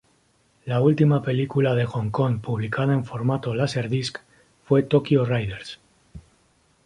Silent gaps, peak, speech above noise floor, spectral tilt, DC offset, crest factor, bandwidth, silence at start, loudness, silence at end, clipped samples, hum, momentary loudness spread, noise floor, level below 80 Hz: none; -4 dBFS; 41 dB; -7.5 dB/octave; under 0.1%; 18 dB; 11 kHz; 0.65 s; -23 LUFS; 0.65 s; under 0.1%; none; 12 LU; -63 dBFS; -54 dBFS